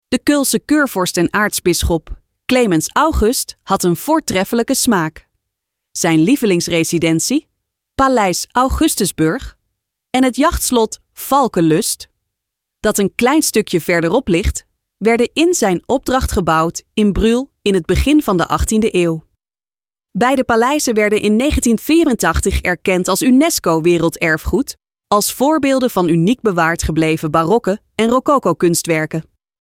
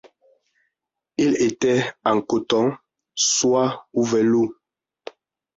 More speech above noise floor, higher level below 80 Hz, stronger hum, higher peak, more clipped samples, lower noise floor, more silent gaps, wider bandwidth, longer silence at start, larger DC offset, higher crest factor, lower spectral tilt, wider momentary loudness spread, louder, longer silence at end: first, over 76 dB vs 62 dB; first, -30 dBFS vs -62 dBFS; neither; first, -2 dBFS vs -6 dBFS; neither; first, under -90 dBFS vs -81 dBFS; neither; first, 17.5 kHz vs 8 kHz; second, 0.1 s vs 1.2 s; neither; about the same, 14 dB vs 16 dB; about the same, -4.5 dB/octave vs -3.5 dB/octave; second, 6 LU vs 23 LU; first, -15 LUFS vs -21 LUFS; second, 0.4 s vs 1.05 s